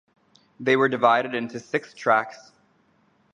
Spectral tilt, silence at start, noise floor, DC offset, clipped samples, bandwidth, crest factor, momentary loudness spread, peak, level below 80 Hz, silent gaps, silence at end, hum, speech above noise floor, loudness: -5.5 dB/octave; 0.6 s; -63 dBFS; under 0.1%; under 0.1%; 9.8 kHz; 20 dB; 11 LU; -4 dBFS; -76 dBFS; none; 0.95 s; none; 41 dB; -23 LUFS